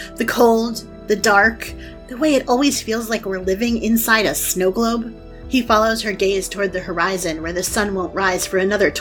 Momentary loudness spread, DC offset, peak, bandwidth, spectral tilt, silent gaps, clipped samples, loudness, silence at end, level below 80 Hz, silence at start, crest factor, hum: 9 LU; under 0.1%; 0 dBFS; 19 kHz; -3.5 dB/octave; none; under 0.1%; -18 LUFS; 0 s; -40 dBFS; 0 s; 18 dB; none